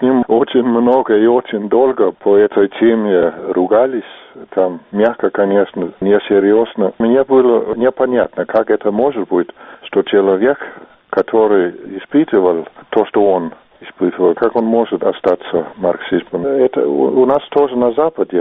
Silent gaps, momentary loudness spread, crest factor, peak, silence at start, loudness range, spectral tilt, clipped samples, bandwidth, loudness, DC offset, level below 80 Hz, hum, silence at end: none; 7 LU; 14 dB; 0 dBFS; 0 s; 3 LU; -5 dB/octave; under 0.1%; 4 kHz; -14 LUFS; under 0.1%; -54 dBFS; none; 0 s